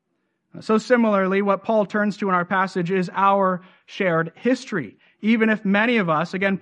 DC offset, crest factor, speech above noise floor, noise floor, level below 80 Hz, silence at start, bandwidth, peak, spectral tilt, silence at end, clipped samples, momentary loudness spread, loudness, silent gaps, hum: under 0.1%; 16 dB; 52 dB; -73 dBFS; -72 dBFS; 0.55 s; 9.4 kHz; -4 dBFS; -6.5 dB/octave; 0 s; under 0.1%; 9 LU; -21 LUFS; none; none